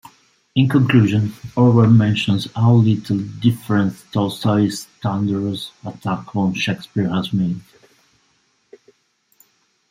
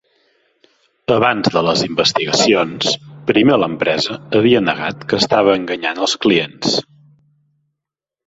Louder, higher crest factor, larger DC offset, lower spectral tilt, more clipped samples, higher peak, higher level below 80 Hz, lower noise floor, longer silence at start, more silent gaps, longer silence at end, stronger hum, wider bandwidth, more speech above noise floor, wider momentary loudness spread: second, -18 LUFS vs -15 LUFS; about the same, 16 dB vs 16 dB; neither; first, -7 dB/octave vs -4 dB/octave; neither; about the same, -2 dBFS vs 0 dBFS; about the same, -56 dBFS vs -54 dBFS; second, -63 dBFS vs -84 dBFS; second, 0.55 s vs 1.1 s; neither; first, 2.3 s vs 1.45 s; neither; first, 15 kHz vs 8 kHz; second, 46 dB vs 69 dB; first, 11 LU vs 6 LU